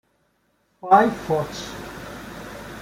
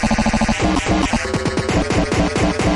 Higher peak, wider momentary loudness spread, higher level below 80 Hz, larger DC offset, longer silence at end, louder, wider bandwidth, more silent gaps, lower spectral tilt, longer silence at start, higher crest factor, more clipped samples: about the same, -2 dBFS vs -4 dBFS; first, 20 LU vs 2 LU; second, -52 dBFS vs -28 dBFS; neither; about the same, 0 s vs 0 s; about the same, -20 LUFS vs -18 LUFS; first, 16 kHz vs 11.5 kHz; neither; about the same, -5.5 dB/octave vs -5 dB/octave; first, 0.85 s vs 0 s; first, 22 dB vs 14 dB; neither